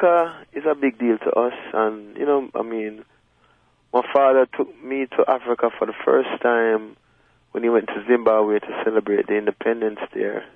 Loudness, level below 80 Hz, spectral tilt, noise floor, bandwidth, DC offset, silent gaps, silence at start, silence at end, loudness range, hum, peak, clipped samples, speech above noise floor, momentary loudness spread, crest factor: -21 LUFS; -68 dBFS; -7.5 dB/octave; -60 dBFS; 3.7 kHz; under 0.1%; none; 0 s; 0.1 s; 3 LU; none; -4 dBFS; under 0.1%; 39 dB; 9 LU; 16 dB